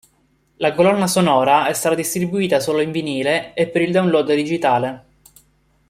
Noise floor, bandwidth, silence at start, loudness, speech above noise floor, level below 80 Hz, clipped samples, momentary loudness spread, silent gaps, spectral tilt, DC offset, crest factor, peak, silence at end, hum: -61 dBFS; 16 kHz; 0.6 s; -18 LUFS; 43 dB; -58 dBFS; under 0.1%; 6 LU; none; -4.5 dB/octave; under 0.1%; 16 dB; -2 dBFS; 0.9 s; none